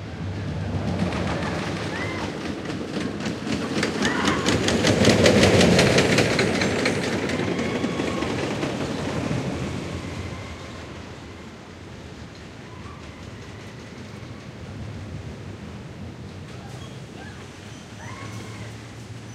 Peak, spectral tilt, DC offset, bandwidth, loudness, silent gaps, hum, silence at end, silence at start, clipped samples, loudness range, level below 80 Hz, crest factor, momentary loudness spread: -2 dBFS; -4.5 dB/octave; under 0.1%; 16 kHz; -23 LUFS; none; none; 0 s; 0 s; under 0.1%; 19 LU; -44 dBFS; 24 dB; 21 LU